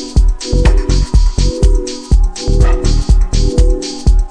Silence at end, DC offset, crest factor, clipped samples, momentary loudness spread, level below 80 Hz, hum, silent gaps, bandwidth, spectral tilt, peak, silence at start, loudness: 0 s; under 0.1%; 10 dB; 0.4%; 2 LU; -10 dBFS; none; none; 9.8 kHz; -6 dB/octave; 0 dBFS; 0 s; -14 LUFS